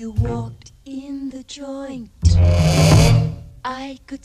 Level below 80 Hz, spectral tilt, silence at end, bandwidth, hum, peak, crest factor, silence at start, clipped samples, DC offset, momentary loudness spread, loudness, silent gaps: -26 dBFS; -6 dB/octave; 0.05 s; 13.5 kHz; none; -2 dBFS; 16 dB; 0 s; under 0.1%; under 0.1%; 20 LU; -16 LUFS; none